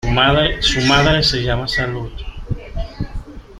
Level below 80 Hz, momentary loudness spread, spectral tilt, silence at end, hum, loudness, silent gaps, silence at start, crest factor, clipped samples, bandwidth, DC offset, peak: -28 dBFS; 17 LU; -4.5 dB/octave; 0 s; none; -15 LUFS; none; 0.05 s; 16 dB; under 0.1%; 14 kHz; under 0.1%; -2 dBFS